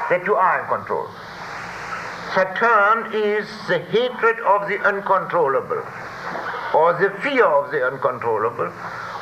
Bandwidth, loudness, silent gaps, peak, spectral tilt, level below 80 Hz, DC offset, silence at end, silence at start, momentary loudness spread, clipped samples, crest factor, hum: 14.5 kHz; -20 LUFS; none; -4 dBFS; -5.5 dB/octave; -60 dBFS; under 0.1%; 0 s; 0 s; 13 LU; under 0.1%; 16 dB; none